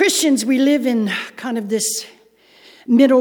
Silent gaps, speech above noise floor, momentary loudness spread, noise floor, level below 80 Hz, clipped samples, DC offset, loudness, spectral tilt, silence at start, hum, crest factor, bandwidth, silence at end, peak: none; 35 dB; 11 LU; -51 dBFS; -74 dBFS; under 0.1%; under 0.1%; -17 LUFS; -3 dB/octave; 0 s; none; 16 dB; 19.5 kHz; 0 s; -2 dBFS